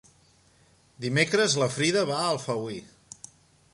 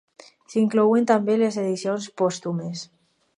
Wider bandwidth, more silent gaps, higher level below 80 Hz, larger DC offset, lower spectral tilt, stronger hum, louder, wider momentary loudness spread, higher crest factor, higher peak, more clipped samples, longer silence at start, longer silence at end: about the same, 11.5 kHz vs 10.5 kHz; neither; first, -66 dBFS vs -74 dBFS; neither; second, -3.5 dB/octave vs -6 dB/octave; neither; second, -26 LUFS vs -22 LUFS; first, 23 LU vs 13 LU; about the same, 20 dB vs 18 dB; second, -10 dBFS vs -4 dBFS; neither; first, 1 s vs 0.5 s; first, 0.9 s vs 0.5 s